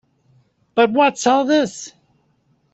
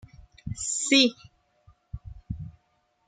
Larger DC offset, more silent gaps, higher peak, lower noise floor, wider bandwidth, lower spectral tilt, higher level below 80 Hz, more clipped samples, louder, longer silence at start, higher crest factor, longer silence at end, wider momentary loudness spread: neither; neither; first, -2 dBFS vs -6 dBFS; second, -62 dBFS vs -71 dBFS; second, 8.2 kHz vs 9.6 kHz; about the same, -3.5 dB/octave vs -2.5 dB/octave; second, -66 dBFS vs -50 dBFS; neither; first, -17 LUFS vs -23 LUFS; first, 0.75 s vs 0.2 s; about the same, 18 dB vs 22 dB; first, 0.85 s vs 0.6 s; second, 16 LU vs 24 LU